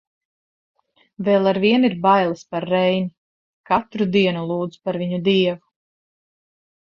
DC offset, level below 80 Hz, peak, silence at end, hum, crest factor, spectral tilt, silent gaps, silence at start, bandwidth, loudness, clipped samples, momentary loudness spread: under 0.1%; -62 dBFS; -2 dBFS; 1.25 s; none; 18 dB; -7.5 dB/octave; 3.17-3.64 s; 1.2 s; 7.2 kHz; -20 LUFS; under 0.1%; 9 LU